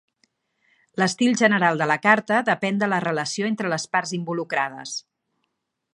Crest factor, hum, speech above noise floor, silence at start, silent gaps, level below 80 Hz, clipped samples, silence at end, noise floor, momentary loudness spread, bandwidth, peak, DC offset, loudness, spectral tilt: 22 dB; none; 55 dB; 0.95 s; none; -74 dBFS; under 0.1%; 0.95 s; -77 dBFS; 10 LU; 11.5 kHz; -2 dBFS; under 0.1%; -22 LUFS; -4.5 dB/octave